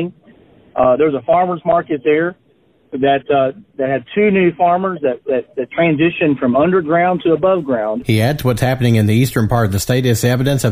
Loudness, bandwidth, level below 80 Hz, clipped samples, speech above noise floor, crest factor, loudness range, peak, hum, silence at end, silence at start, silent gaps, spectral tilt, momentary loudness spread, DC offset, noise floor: -15 LUFS; 16 kHz; -42 dBFS; under 0.1%; 40 dB; 12 dB; 2 LU; -2 dBFS; none; 0 s; 0 s; none; -6.5 dB/octave; 7 LU; under 0.1%; -54 dBFS